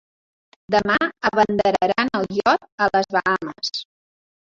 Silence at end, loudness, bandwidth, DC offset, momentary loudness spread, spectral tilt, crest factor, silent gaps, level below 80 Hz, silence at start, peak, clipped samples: 0.65 s; -20 LUFS; 7.8 kHz; under 0.1%; 7 LU; -4.5 dB/octave; 18 dB; 2.72-2.78 s; -54 dBFS; 0.7 s; -2 dBFS; under 0.1%